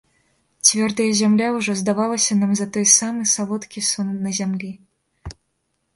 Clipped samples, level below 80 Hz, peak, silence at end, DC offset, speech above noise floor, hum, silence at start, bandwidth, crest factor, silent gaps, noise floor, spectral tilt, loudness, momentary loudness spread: under 0.1%; -52 dBFS; 0 dBFS; 0.65 s; under 0.1%; 52 dB; none; 0.65 s; 11.5 kHz; 20 dB; none; -71 dBFS; -3 dB/octave; -18 LUFS; 13 LU